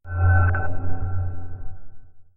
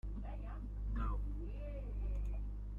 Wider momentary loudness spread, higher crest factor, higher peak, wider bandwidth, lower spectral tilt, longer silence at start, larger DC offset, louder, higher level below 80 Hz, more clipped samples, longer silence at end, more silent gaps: first, 21 LU vs 6 LU; about the same, 14 dB vs 12 dB; first, -8 dBFS vs -30 dBFS; second, 2.8 kHz vs 3.5 kHz; first, -13 dB/octave vs -9.5 dB/octave; about the same, 0.05 s vs 0.05 s; neither; first, -24 LUFS vs -45 LUFS; first, -34 dBFS vs -42 dBFS; neither; first, 0.15 s vs 0 s; neither